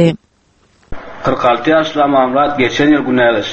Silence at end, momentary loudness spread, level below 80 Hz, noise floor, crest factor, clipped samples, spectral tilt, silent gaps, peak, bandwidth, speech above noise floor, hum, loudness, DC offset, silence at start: 0 s; 13 LU; -40 dBFS; -54 dBFS; 14 dB; under 0.1%; -6 dB/octave; none; 0 dBFS; 8.4 kHz; 42 dB; none; -12 LUFS; under 0.1%; 0 s